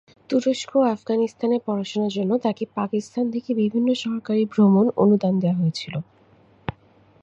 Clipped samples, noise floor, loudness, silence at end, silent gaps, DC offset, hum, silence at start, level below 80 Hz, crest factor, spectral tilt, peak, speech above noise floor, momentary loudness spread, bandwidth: under 0.1%; -55 dBFS; -22 LUFS; 0.5 s; none; under 0.1%; none; 0.3 s; -60 dBFS; 16 dB; -7 dB/octave; -6 dBFS; 34 dB; 12 LU; 8 kHz